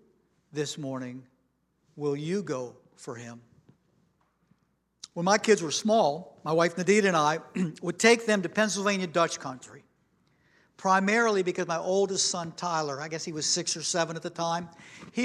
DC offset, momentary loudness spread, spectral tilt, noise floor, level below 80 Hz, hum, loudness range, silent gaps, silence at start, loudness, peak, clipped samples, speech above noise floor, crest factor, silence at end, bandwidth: under 0.1%; 19 LU; -3.5 dB/octave; -72 dBFS; -76 dBFS; none; 12 LU; none; 0.55 s; -27 LUFS; -4 dBFS; under 0.1%; 45 dB; 24 dB; 0 s; 13.5 kHz